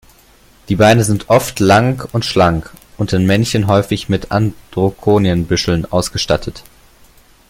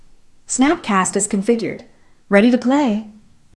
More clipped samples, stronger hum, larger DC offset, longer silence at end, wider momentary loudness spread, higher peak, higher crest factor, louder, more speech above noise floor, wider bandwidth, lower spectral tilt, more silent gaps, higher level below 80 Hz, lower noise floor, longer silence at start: neither; neither; neither; first, 0.9 s vs 0.45 s; second, 8 LU vs 11 LU; about the same, 0 dBFS vs 0 dBFS; about the same, 14 dB vs 18 dB; first, -14 LUFS vs -17 LUFS; first, 33 dB vs 28 dB; first, 16.5 kHz vs 12 kHz; about the same, -5.5 dB/octave vs -4.5 dB/octave; neither; first, -38 dBFS vs -50 dBFS; about the same, -47 dBFS vs -44 dBFS; first, 0.7 s vs 0.5 s